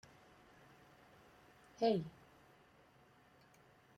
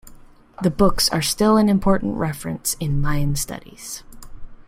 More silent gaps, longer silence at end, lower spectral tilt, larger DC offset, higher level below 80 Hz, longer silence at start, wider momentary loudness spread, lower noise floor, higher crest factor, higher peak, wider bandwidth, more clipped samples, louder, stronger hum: neither; first, 1.9 s vs 0.05 s; first, -7 dB/octave vs -5 dB/octave; neither; second, -78 dBFS vs -32 dBFS; first, 1.8 s vs 0.05 s; first, 28 LU vs 17 LU; first, -68 dBFS vs -44 dBFS; about the same, 22 dB vs 18 dB; second, -24 dBFS vs -2 dBFS; about the same, 15.5 kHz vs 16.5 kHz; neither; second, -39 LUFS vs -20 LUFS; neither